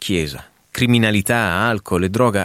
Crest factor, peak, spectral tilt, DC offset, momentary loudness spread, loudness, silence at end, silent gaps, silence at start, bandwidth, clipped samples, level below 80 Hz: 16 dB; -2 dBFS; -5 dB/octave; under 0.1%; 12 LU; -18 LUFS; 0 s; none; 0 s; 16.5 kHz; under 0.1%; -44 dBFS